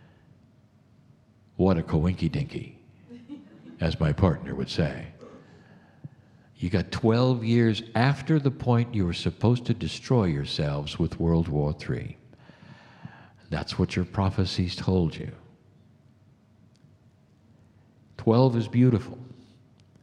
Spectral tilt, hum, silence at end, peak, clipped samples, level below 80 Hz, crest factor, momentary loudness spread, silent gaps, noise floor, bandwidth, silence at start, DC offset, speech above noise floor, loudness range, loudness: -7.5 dB/octave; none; 0.7 s; -4 dBFS; under 0.1%; -46 dBFS; 22 dB; 21 LU; none; -59 dBFS; 10 kHz; 1.6 s; under 0.1%; 34 dB; 6 LU; -26 LUFS